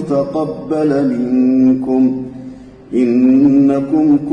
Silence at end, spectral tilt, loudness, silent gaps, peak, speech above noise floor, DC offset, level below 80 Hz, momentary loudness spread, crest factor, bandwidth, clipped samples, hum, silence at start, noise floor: 0 s; -9 dB/octave; -13 LUFS; none; -2 dBFS; 21 dB; under 0.1%; -48 dBFS; 12 LU; 10 dB; 6 kHz; under 0.1%; none; 0 s; -33 dBFS